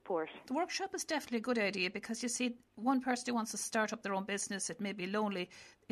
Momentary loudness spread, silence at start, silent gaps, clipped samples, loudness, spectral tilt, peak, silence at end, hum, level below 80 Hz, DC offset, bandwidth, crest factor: 5 LU; 0.05 s; none; under 0.1%; -37 LUFS; -3 dB/octave; -20 dBFS; 0.2 s; none; -78 dBFS; under 0.1%; 13.5 kHz; 16 dB